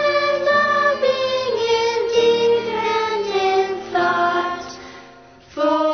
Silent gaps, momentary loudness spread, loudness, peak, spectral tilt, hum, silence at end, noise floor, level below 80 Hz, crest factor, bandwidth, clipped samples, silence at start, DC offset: none; 9 LU; -18 LUFS; -6 dBFS; -3.5 dB/octave; none; 0 s; -44 dBFS; -58 dBFS; 14 dB; 6.6 kHz; under 0.1%; 0 s; under 0.1%